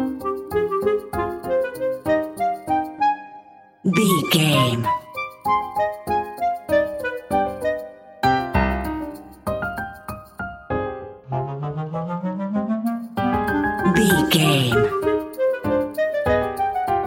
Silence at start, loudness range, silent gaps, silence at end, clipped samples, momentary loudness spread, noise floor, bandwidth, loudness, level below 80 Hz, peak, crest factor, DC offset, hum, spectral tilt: 0 s; 8 LU; none; 0 s; under 0.1%; 13 LU; -45 dBFS; 16.5 kHz; -22 LUFS; -42 dBFS; -4 dBFS; 18 dB; under 0.1%; none; -5 dB/octave